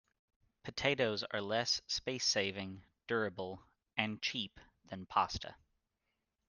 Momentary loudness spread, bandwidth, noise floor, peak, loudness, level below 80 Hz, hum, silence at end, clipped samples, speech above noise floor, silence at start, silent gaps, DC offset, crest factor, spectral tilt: 17 LU; 11 kHz; -86 dBFS; -14 dBFS; -37 LUFS; -66 dBFS; none; 0.95 s; under 0.1%; 49 dB; 0.65 s; none; under 0.1%; 24 dB; -3 dB/octave